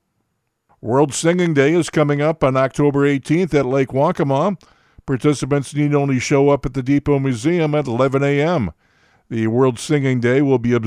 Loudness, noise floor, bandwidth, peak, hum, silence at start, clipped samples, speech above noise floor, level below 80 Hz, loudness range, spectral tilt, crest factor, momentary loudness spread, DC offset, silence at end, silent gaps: -17 LUFS; -71 dBFS; 12 kHz; -2 dBFS; none; 0.85 s; under 0.1%; 54 dB; -46 dBFS; 2 LU; -6.5 dB/octave; 16 dB; 5 LU; under 0.1%; 0 s; none